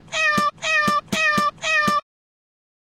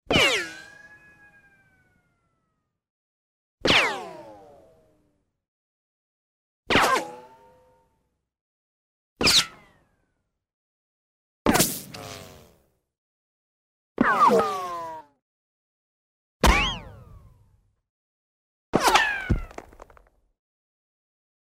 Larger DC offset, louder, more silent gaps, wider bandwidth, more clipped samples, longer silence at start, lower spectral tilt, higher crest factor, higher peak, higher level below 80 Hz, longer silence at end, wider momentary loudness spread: neither; first, -19 LUFS vs -22 LUFS; second, none vs 2.90-3.58 s, 5.48-6.63 s, 8.41-9.16 s, 10.54-11.45 s, 12.98-13.95 s, 15.22-16.40 s, 17.89-18.73 s; about the same, 16.5 kHz vs 16 kHz; neither; about the same, 0.1 s vs 0.1 s; about the same, -2.5 dB/octave vs -3 dB/octave; second, 16 dB vs 24 dB; about the same, -6 dBFS vs -4 dBFS; second, -56 dBFS vs -40 dBFS; second, 1 s vs 1.85 s; second, 3 LU vs 22 LU